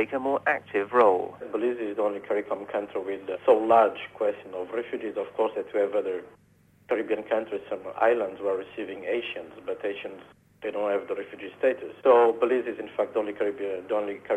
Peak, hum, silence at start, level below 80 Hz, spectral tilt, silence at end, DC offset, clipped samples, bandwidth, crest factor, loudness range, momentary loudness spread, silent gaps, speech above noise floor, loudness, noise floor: -8 dBFS; none; 0 s; -72 dBFS; -6 dB/octave; 0 s; under 0.1%; under 0.1%; 9 kHz; 18 dB; 5 LU; 13 LU; none; 30 dB; -27 LUFS; -57 dBFS